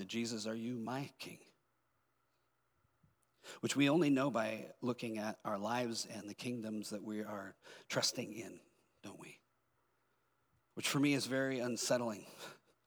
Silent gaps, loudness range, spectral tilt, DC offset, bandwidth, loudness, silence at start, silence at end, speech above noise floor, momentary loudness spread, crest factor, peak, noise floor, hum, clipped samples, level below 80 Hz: none; 7 LU; -4 dB/octave; under 0.1%; over 20 kHz; -38 LUFS; 0 s; 0.3 s; 42 dB; 20 LU; 20 dB; -20 dBFS; -81 dBFS; none; under 0.1%; under -90 dBFS